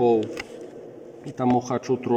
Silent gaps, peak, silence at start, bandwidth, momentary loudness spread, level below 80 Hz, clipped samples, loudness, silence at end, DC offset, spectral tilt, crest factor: none; -10 dBFS; 0 s; 9.2 kHz; 19 LU; -64 dBFS; under 0.1%; -25 LUFS; 0 s; under 0.1%; -7 dB/octave; 14 dB